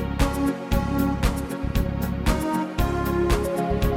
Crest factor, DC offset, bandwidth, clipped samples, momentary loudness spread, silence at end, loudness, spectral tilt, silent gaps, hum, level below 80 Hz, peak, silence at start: 16 dB; under 0.1%; 17 kHz; under 0.1%; 3 LU; 0 s; -25 LUFS; -6.5 dB/octave; none; none; -28 dBFS; -8 dBFS; 0 s